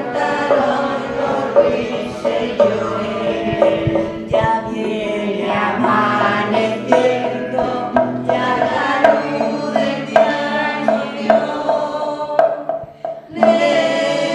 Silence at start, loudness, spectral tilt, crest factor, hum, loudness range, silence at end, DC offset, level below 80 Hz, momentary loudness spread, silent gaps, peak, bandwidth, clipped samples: 0 s; -17 LUFS; -5.5 dB/octave; 16 dB; none; 2 LU; 0 s; under 0.1%; -48 dBFS; 6 LU; none; 0 dBFS; 10.5 kHz; under 0.1%